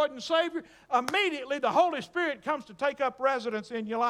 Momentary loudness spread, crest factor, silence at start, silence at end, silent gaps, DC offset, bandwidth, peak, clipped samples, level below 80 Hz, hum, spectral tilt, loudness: 8 LU; 18 dB; 0 s; 0 s; none; under 0.1%; 16 kHz; -12 dBFS; under 0.1%; -72 dBFS; none; -3.5 dB/octave; -29 LUFS